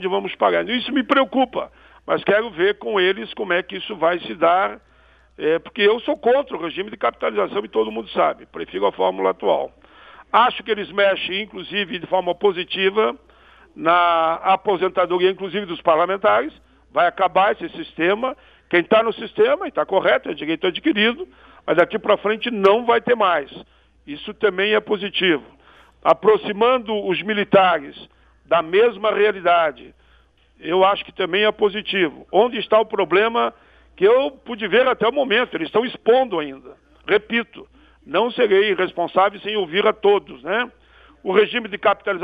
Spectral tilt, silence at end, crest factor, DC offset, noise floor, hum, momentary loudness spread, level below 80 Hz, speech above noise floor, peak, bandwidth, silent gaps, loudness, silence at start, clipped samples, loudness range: -7 dB/octave; 0 s; 18 dB; under 0.1%; -55 dBFS; none; 9 LU; -58 dBFS; 36 dB; -2 dBFS; 5 kHz; none; -19 LUFS; 0 s; under 0.1%; 2 LU